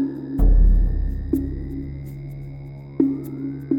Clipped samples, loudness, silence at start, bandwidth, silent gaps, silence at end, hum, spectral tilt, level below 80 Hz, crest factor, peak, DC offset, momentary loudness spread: under 0.1%; -24 LUFS; 0 s; 2.3 kHz; none; 0 s; none; -10.5 dB/octave; -22 dBFS; 16 dB; -4 dBFS; under 0.1%; 16 LU